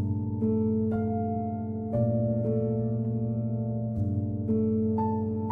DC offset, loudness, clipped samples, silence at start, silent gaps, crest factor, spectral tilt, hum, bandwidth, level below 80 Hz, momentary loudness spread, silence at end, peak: under 0.1%; -29 LUFS; under 0.1%; 0 s; none; 12 dB; -14 dB/octave; none; 2.4 kHz; -54 dBFS; 4 LU; 0 s; -16 dBFS